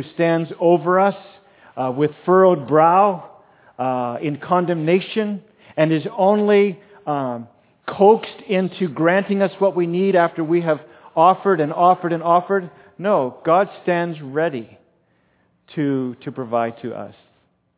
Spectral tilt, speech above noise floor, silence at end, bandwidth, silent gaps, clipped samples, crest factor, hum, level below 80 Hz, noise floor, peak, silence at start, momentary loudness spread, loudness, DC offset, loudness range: -11 dB/octave; 44 dB; 0.65 s; 4 kHz; none; under 0.1%; 18 dB; none; -70 dBFS; -62 dBFS; -2 dBFS; 0 s; 16 LU; -18 LUFS; under 0.1%; 5 LU